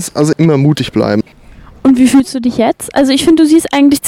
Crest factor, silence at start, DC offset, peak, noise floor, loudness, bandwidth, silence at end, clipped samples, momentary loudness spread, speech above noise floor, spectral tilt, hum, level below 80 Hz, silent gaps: 10 dB; 0 s; under 0.1%; 0 dBFS; -36 dBFS; -10 LUFS; 16 kHz; 0 s; under 0.1%; 6 LU; 27 dB; -5.5 dB/octave; none; -42 dBFS; none